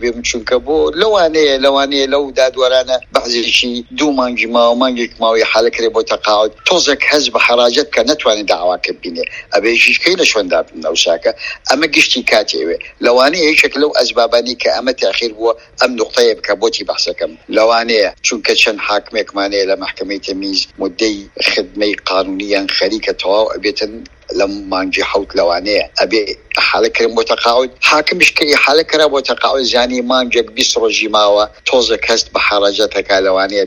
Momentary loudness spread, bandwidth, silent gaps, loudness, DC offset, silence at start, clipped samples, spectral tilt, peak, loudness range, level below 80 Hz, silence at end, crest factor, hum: 7 LU; 17.5 kHz; none; -12 LUFS; under 0.1%; 0 s; 0.1%; -1.5 dB/octave; 0 dBFS; 4 LU; -44 dBFS; 0 s; 14 dB; none